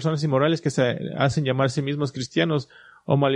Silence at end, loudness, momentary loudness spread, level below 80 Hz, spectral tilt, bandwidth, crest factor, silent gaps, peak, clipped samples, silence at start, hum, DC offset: 0 s; -23 LUFS; 6 LU; -58 dBFS; -6.5 dB/octave; 10 kHz; 16 dB; none; -6 dBFS; under 0.1%; 0 s; none; under 0.1%